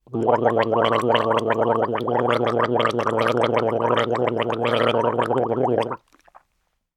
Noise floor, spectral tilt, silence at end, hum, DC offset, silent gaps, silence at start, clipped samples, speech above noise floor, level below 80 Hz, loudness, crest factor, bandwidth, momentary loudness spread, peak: -72 dBFS; -6.5 dB/octave; 1 s; none; under 0.1%; none; 0.1 s; under 0.1%; 51 dB; -66 dBFS; -21 LUFS; 18 dB; 12 kHz; 3 LU; -2 dBFS